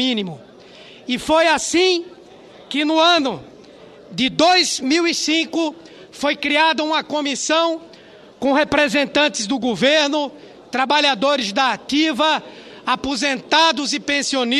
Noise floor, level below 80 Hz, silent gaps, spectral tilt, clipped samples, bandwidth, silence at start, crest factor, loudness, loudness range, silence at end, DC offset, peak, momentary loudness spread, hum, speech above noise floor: -44 dBFS; -54 dBFS; none; -2.5 dB/octave; under 0.1%; 13 kHz; 0 s; 18 dB; -17 LUFS; 2 LU; 0 s; under 0.1%; 0 dBFS; 11 LU; none; 26 dB